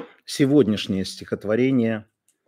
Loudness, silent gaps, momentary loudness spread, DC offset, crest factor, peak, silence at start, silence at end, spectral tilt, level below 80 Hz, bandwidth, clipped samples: -22 LUFS; none; 12 LU; under 0.1%; 16 dB; -6 dBFS; 0 s; 0.45 s; -6 dB/octave; -62 dBFS; 16 kHz; under 0.1%